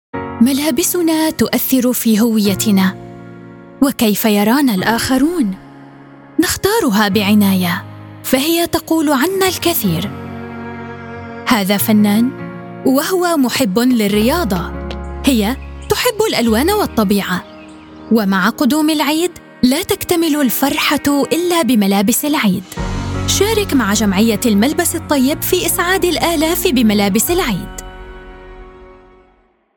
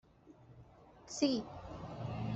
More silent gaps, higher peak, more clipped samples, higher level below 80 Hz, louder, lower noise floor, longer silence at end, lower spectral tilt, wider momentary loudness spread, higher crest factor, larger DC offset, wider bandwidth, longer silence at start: neither; first, 0 dBFS vs -20 dBFS; neither; first, -36 dBFS vs -62 dBFS; first, -14 LUFS vs -39 LUFS; second, -54 dBFS vs -61 dBFS; first, 0.85 s vs 0 s; second, -4 dB/octave vs -5.5 dB/octave; second, 13 LU vs 25 LU; second, 14 dB vs 22 dB; neither; first, 19 kHz vs 8.2 kHz; about the same, 0.15 s vs 0.25 s